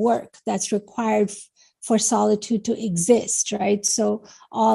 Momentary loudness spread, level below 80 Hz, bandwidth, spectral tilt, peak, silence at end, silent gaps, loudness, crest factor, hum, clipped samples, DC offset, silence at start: 9 LU; -64 dBFS; 12.5 kHz; -4 dB/octave; -4 dBFS; 0 s; none; -22 LUFS; 18 dB; none; under 0.1%; under 0.1%; 0 s